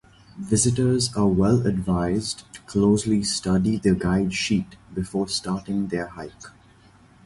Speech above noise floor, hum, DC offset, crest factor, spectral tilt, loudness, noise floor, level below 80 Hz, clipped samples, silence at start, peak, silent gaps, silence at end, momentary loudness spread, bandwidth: 30 dB; none; under 0.1%; 16 dB; -5 dB/octave; -23 LUFS; -53 dBFS; -44 dBFS; under 0.1%; 0.35 s; -6 dBFS; none; 0.75 s; 12 LU; 11.5 kHz